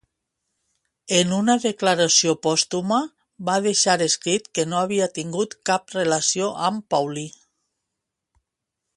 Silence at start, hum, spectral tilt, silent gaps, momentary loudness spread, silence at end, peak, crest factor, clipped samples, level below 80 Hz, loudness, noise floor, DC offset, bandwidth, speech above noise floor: 1.1 s; none; -3 dB/octave; none; 9 LU; 1.65 s; -2 dBFS; 20 dB; under 0.1%; -66 dBFS; -21 LUFS; -82 dBFS; under 0.1%; 11.5 kHz; 61 dB